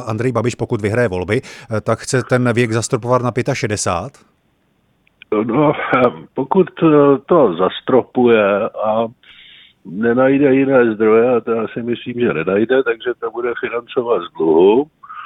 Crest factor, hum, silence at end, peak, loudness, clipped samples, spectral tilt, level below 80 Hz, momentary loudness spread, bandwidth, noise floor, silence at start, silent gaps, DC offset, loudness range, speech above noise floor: 16 dB; none; 0 s; 0 dBFS; -16 LUFS; under 0.1%; -6 dB/octave; -52 dBFS; 10 LU; 12 kHz; -60 dBFS; 0 s; none; under 0.1%; 5 LU; 45 dB